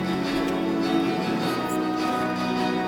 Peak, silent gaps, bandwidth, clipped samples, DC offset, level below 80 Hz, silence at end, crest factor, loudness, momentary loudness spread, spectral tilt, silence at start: -12 dBFS; none; 19 kHz; under 0.1%; under 0.1%; -54 dBFS; 0 s; 12 dB; -25 LUFS; 2 LU; -5.5 dB/octave; 0 s